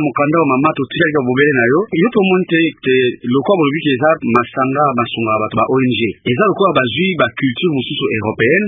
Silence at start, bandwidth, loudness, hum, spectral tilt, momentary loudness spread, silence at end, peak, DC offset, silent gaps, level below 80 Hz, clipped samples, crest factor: 0 s; 3.9 kHz; -14 LUFS; none; -9 dB/octave; 5 LU; 0 s; 0 dBFS; under 0.1%; none; -50 dBFS; under 0.1%; 14 dB